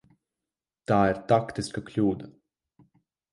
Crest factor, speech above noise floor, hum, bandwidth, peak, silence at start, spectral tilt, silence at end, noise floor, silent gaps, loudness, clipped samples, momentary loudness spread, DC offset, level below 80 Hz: 22 dB; 64 dB; none; 11.5 kHz; -8 dBFS; 0.9 s; -7 dB/octave; 1 s; -90 dBFS; none; -26 LUFS; under 0.1%; 15 LU; under 0.1%; -56 dBFS